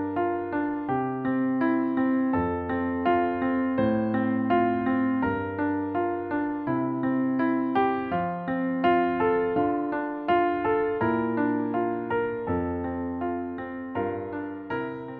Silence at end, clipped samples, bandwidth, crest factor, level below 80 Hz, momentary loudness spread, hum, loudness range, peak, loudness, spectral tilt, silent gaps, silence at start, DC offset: 0 s; under 0.1%; 4.6 kHz; 14 dB; -56 dBFS; 7 LU; none; 3 LU; -12 dBFS; -26 LUFS; -10.5 dB/octave; none; 0 s; under 0.1%